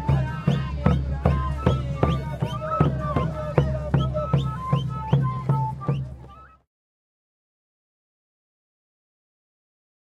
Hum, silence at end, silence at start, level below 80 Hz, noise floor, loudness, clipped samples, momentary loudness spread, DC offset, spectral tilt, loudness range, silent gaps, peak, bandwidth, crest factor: none; 3.65 s; 0 s; -36 dBFS; -45 dBFS; -25 LUFS; under 0.1%; 5 LU; under 0.1%; -8.5 dB/octave; 8 LU; none; 0 dBFS; 7.2 kHz; 24 dB